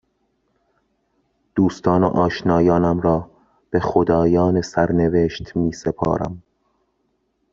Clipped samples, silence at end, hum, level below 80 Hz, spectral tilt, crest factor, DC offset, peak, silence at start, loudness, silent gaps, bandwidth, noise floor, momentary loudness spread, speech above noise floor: under 0.1%; 1.15 s; none; -46 dBFS; -7 dB/octave; 18 dB; under 0.1%; -2 dBFS; 1.55 s; -19 LUFS; none; 7.6 kHz; -69 dBFS; 8 LU; 51 dB